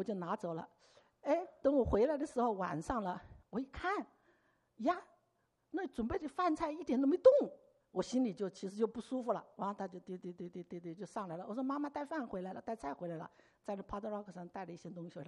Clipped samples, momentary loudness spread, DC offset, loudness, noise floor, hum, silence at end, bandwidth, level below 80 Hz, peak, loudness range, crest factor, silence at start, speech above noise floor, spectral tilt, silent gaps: under 0.1%; 14 LU; under 0.1%; -38 LUFS; -80 dBFS; none; 0 s; 11 kHz; -60 dBFS; -14 dBFS; 9 LU; 24 dB; 0 s; 43 dB; -6.5 dB/octave; none